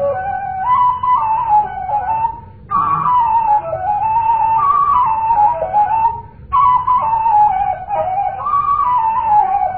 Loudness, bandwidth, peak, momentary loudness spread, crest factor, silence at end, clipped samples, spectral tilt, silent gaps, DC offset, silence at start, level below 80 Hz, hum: -15 LUFS; 4.2 kHz; -2 dBFS; 7 LU; 12 dB; 0 s; under 0.1%; -10.5 dB/octave; none; 0.4%; 0 s; -42 dBFS; none